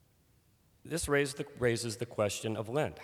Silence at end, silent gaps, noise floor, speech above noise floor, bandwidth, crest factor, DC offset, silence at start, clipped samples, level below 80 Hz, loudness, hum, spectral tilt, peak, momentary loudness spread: 0 s; none; -68 dBFS; 35 dB; 19.5 kHz; 18 dB; under 0.1%; 0.85 s; under 0.1%; -58 dBFS; -34 LUFS; none; -4.5 dB/octave; -16 dBFS; 6 LU